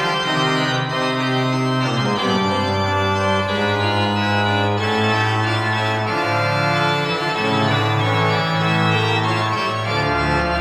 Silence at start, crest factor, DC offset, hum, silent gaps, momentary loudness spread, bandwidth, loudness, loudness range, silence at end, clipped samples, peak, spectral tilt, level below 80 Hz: 0 s; 14 dB; under 0.1%; none; none; 2 LU; 13 kHz; -18 LUFS; 1 LU; 0 s; under 0.1%; -6 dBFS; -5.5 dB/octave; -42 dBFS